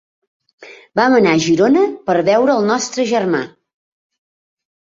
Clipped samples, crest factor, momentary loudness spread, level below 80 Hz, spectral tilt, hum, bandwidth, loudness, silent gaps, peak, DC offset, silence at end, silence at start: under 0.1%; 16 dB; 8 LU; -58 dBFS; -5 dB/octave; none; 7.8 kHz; -14 LUFS; none; -2 dBFS; under 0.1%; 1.4 s; 0.6 s